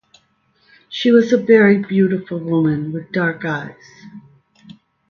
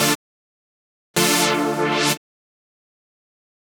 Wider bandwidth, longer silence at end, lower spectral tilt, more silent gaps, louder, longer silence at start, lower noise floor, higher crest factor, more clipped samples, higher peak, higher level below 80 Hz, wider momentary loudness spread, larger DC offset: second, 7 kHz vs over 20 kHz; second, 0.9 s vs 1.6 s; first, -7.5 dB/octave vs -2.5 dB/octave; second, none vs 0.15-1.14 s; first, -16 LUFS vs -19 LUFS; first, 0.9 s vs 0 s; second, -60 dBFS vs under -90 dBFS; about the same, 18 dB vs 22 dB; neither; about the same, 0 dBFS vs -2 dBFS; first, -60 dBFS vs -68 dBFS; first, 13 LU vs 9 LU; neither